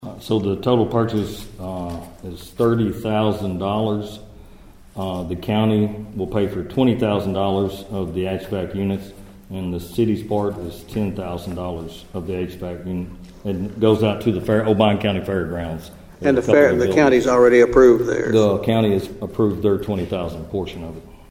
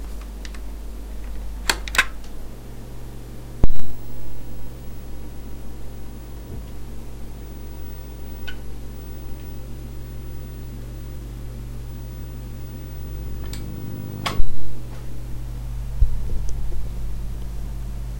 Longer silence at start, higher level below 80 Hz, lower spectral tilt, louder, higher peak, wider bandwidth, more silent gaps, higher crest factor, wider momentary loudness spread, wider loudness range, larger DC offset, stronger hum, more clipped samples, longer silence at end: about the same, 0 s vs 0 s; second, -42 dBFS vs -30 dBFS; first, -7 dB/octave vs -4 dB/octave; first, -20 LUFS vs -32 LUFS; about the same, 0 dBFS vs 0 dBFS; about the same, 16 kHz vs 16.5 kHz; neither; about the same, 20 dB vs 18 dB; first, 17 LU vs 13 LU; about the same, 10 LU vs 10 LU; neither; neither; neither; first, 0.15 s vs 0 s